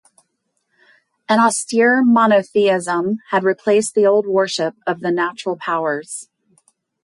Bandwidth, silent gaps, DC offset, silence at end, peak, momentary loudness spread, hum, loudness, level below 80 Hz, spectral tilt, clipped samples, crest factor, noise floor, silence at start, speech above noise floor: 11.5 kHz; none; under 0.1%; 0.8 s; -4 dBFS; 9 LU; none; -17 LUFS; -70 dBFS; -4 dB/octave; under 0.1%; 14 dB; -71 dBFS; 1.3 s; 54 dB